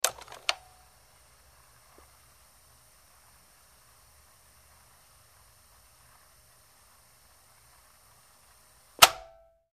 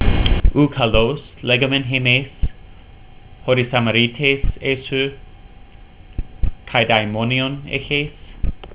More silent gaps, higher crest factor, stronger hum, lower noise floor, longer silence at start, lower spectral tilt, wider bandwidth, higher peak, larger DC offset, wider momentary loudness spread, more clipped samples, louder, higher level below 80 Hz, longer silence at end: neither; first, 36 dB vs 18 dB; neither; first, -60 dBFS vs -41 dBFS; about the same, 0.05 s vs 0 s; second, 1 dB/octave vs -9.5 dB/octave; first, 15.5 kHz vs 4 kHz; about the same, 0 dBFS vs 0 dBFS; neither; first, 25 LU vs 13 LU; neither; second, -23 LUFS vs -18 LUFS; second, -66 dBFS vs -26 dBFS; first, 0.6 s vs 0 s